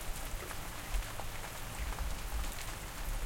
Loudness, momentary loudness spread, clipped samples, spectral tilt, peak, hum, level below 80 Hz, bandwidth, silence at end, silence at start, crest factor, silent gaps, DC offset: -42 LUFS; 2 LU; under 0.1%; -3 dB/octave; -22 dBFS; none; -40 dBFS; 17 kHz; 0 s; 0 s; 16 dB; none; under 0.1%